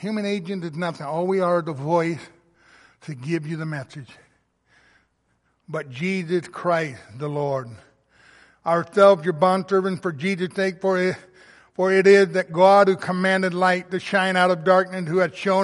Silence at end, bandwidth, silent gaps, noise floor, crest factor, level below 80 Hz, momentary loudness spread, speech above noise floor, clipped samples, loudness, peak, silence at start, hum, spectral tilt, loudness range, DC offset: 0 s; 11.5 kHz; none; -68 dBFS; 20 dB; -68 dBFS; 16 LU; 47 dB; under 0.1%; -21 LUFS; -2 dBFS; 0 s; none; -6 dB/octave; 13 LU; under 0.1%